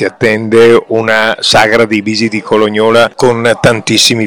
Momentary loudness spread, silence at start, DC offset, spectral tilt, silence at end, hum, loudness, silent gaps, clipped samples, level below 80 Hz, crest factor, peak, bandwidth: 5 LU; 0 s; 1%; -4 dB/octave; 0 s; none; -8 LUFS; none; 3%; -42 dBFS; 8 dB; 0 dBFS; 18.5 kHz